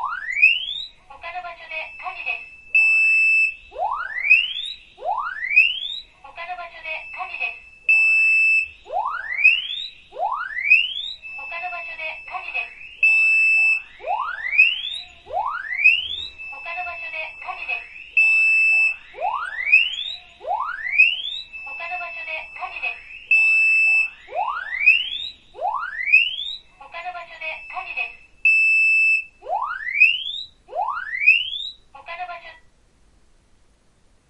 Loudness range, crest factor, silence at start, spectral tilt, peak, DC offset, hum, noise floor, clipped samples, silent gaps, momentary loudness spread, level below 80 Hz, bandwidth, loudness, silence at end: 5 LU; 18 dB; 0 s; 0.5 dB/octave; -4 dBFS; under 0.1%; none; -58 dBFS; under 0.1%; none; 18 LU; -58 dBFS; 11 kHz; -18 LUFS; 1.75 s